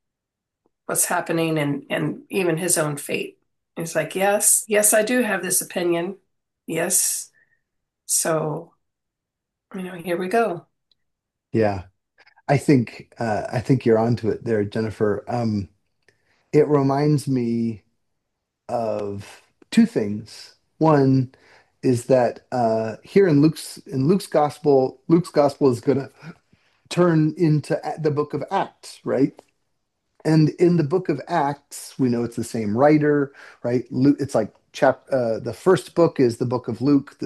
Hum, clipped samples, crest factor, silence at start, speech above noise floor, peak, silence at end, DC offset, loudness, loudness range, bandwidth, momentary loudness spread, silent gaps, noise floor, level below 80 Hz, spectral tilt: none; under 0.1%; 20 dB; 0.9 s; 63 dB; -2 dBFS; 0 s; under 0.1%; -21 LUFS; 5 LU; 12.5 kHz; 12 LU; none; -83 dBFS; -64 dBFS; -5.5 dB/octave